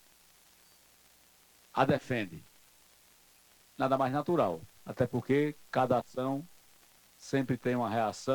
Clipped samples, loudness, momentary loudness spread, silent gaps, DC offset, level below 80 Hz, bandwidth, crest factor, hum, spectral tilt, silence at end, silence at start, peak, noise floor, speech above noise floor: under 0.1%; -32 LUFS; 13 LU; none; under 0.1%; -66 dBFS; 19 kHz; 22 dB; 60 Hz at -65 dBFS; -6.5 dB/octave; 0 s; 1.75 s; -12 dBFS; -63 dBFS; 32 dB